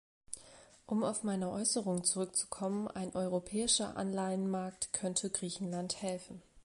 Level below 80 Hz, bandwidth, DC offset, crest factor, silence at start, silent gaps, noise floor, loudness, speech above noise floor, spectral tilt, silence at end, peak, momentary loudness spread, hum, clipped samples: -68 dBFS; 11.5 kHz; under 0.1%; 20 dB; 0.3 s; none; -59 dBFS; -35 LUFS; 23 dB; -3.5 dB/octave; 0.05 s; -16 dBFS; 9 LU; none; under 0.1%